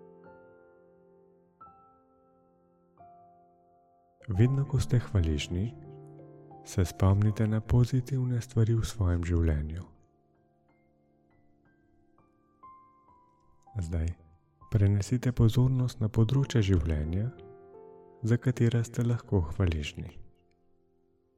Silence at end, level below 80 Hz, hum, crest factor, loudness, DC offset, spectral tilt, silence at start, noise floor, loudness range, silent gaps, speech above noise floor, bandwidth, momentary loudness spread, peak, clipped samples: 1.1 s; -46 dBFS; none; 16 dB; -29 LUFS; under 0.1%; -7.5 dB/octave; 0.25 s; -69 dBFS; 9 LU; none; 41 dB; 13 kHz; 22 LU; -14 dBFS; under 0.1%